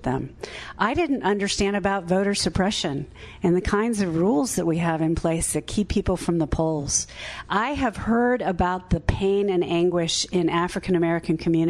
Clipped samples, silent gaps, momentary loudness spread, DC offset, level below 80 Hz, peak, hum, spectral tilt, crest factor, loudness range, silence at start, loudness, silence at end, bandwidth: under 0.1%; none; 5 LU; under 0.1%; -38 dBFS; -6 dBFS; none; -4.5 dB/octave; 16 dB; 1 LU; 0 s; -23 LUFS; 0 s; 12 kHz